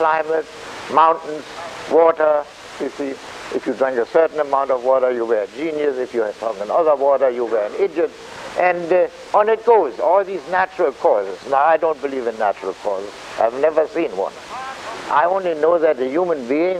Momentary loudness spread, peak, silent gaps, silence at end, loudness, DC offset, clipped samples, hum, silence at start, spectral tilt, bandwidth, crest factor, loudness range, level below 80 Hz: 13 LU; -2 dBFS; none; 0 s; -18 LUFS; under 0.1%; under 0.1%; none; 0 s; -5 dB/octave; 10.5 kHz; 16 dB; 3 LU; -60 dBFS